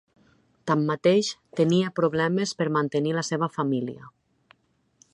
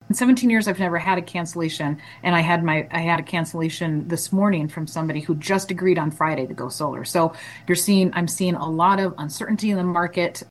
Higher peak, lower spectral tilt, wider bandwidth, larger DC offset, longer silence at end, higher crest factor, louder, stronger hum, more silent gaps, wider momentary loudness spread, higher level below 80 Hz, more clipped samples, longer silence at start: second, -8 dBFS vs -4 dBFS; about the same, -5.5 dB/octave vs -5 dB/octave; second, 11 kHz vs 12.5 kHz; neither; first, 1.05 s vs 0.05 s; about the same, 18 dB vs 16 dB; second, -25 LUFS vs -22 LUFS; neither; neither; about the same, 8 LU vs 8 LU; second, -68 dBFS vs -62 dBFS; neither; first, 0.65 s vs 0.1 s